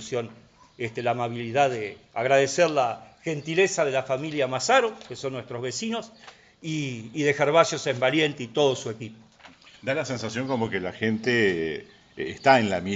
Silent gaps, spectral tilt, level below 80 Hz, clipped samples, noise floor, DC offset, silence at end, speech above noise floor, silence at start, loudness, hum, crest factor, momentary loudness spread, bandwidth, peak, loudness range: none; -4.5 dB/octave; -64 dBFS; under 0.1%; -51 dBFS; under 0.1%; 0 s; 26 dB; 0 s; -25 LUFS; none; 22 dB; 14 LU; 9.2 kHz; -4 dBFS; 4 LU